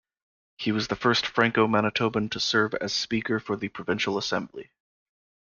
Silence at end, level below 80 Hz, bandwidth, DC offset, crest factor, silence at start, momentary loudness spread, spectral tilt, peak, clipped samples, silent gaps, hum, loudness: 0.8 s; -60 dBFS; 7.2 kHz; under 0.1%; 20 dB; 0.6 s; 9 LU; -4.5 dB/octave; -8 dBFS; under 0.1%; none; none; -26 LUFS